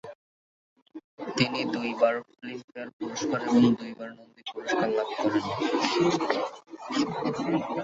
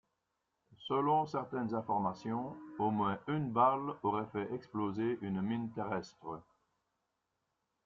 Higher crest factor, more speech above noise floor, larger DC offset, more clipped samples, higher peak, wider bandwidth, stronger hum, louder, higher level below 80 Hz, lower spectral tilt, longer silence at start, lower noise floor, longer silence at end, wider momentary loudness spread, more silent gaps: about the same, 20 dB vs 20 dB; first, over 62 dB vs 49 dB; neither; neither; first, -8 dBFS vs -16 dBFS; about the same, 7.8 kHz vs 7.4 kHz; neither; first, -27 LUFS vs -36 LUFS; first, -66 dBFS vs -74 dBFS; second, -5 dB/octave vs -8 dB/octave; second, 0.05 s vs 0.7 s; first, under -90 dBFS vs -85 dBFS; second, 0 s vs 1.45 s; first, 16 LU vs 11 LU; first, 0.15-0.76 s, 0.82-0.86 s, 1.04-1.18 s, 2.64-2.68 s, 2.93-2.99 s vs none